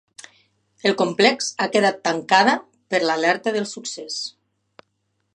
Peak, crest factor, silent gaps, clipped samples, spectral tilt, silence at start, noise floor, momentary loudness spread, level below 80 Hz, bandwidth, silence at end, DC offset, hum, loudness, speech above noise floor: 0 dBFS; 22 dB; none; under 0.1%; -3 dB/octave; 0.85 s; -72 dBFS; 12 LU; -76 dBFS; 11 kHz; 1.05 s; under 0.1%; none; -20 LUFS; 52 dB